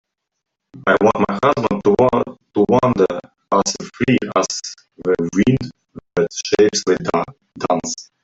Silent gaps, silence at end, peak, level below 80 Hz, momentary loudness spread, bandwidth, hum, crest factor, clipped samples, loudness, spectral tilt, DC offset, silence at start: none; 0.2 s; -2 dBFS; -50 dBFS; 11 LU; 8 kHz; none; 16 dB; under 0.1%; -18 LUFS; -5 dB/octave; under 0.1%; 0.75 s